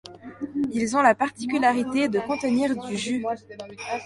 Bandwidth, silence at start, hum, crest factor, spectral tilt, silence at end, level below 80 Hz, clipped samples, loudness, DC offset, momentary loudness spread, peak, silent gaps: 11.5 kHz; 0.05 s; none; 20 dB; -4.5 dB/octave; 0 s; -62 dBFS; under 0.1%; -24 LUFS; under 0.1%; 15 LU; -4 dBFS; none